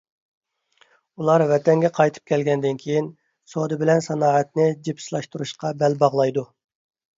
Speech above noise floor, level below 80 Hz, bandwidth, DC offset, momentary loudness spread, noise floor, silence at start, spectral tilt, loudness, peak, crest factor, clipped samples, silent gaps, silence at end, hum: 41 dB; -68 dBFS; 7.8 kHz; under 0.1%; 12 LU; -61 dBFS; 1.2 s; -6.5 dB/octave; -21 LUFS; -4 dBFS; 18 dB; under 0.1%; none; 0.75 s; none